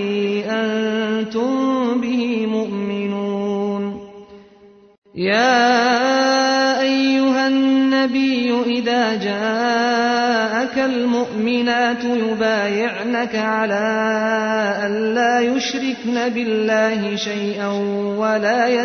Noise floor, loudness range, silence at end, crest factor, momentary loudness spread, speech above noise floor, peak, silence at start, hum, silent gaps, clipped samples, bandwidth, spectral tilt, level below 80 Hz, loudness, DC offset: -47 dBFS; 5 LU; 0 s; 14 dB; 6 LU; 29 dB; -4 dBFS; 0 s; none; 4.98-5.02 s; under 0.1%; 6.6 kHz; -4.5 dB/octave; -62 dBFS; -18 LUFS; under 0.1%